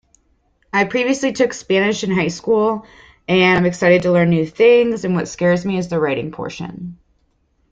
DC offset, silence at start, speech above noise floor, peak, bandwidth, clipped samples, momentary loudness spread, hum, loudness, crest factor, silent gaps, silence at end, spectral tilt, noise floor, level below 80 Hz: under 0.1%; 0.75 s; 46 dB; -2 dBFS; 8 kHz; under 0.1%; 15 LU; none; -16 LUFS; 16 dB; none; 0.8 s; -5.5 dB/octave; -62 dBFS; -52 dBFS